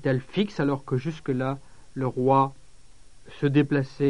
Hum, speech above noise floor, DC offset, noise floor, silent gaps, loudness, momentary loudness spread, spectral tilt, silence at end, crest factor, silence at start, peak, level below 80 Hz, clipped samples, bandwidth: none; 29 dB; 0.5%; -53 dBFS; none; -26 LUFS; 9 LU; -8 dB/octave; 0 s; 18 dB; 0.05 s; -8 dBFS; -56 dBFS; under 0.1%; 10.5 kHz